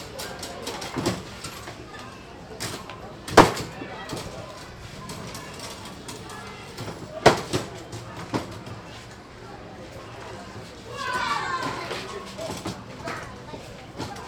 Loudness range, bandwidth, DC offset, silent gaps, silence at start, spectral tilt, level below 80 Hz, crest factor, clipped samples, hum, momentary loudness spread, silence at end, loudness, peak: 11 LU; over 20 kHz; under 0.1%; none; 0 s; -4 dB/octave; -48 dBFS; 30 dB; under 0.1%; none; 19 LU; 0 s; -28 LUFS; 0 dBFS